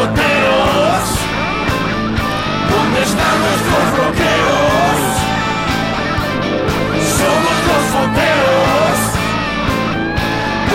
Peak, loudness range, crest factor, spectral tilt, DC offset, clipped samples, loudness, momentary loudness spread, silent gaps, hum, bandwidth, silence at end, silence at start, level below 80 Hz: -4 dBFS; 1 LU; 10 dB; -4.5 dB/octave; under 0.1%; under 0.1%; -14 LUFS; 5 LU; none; none; 16.5 kHz; 0 s; 0 s; -30 dBFS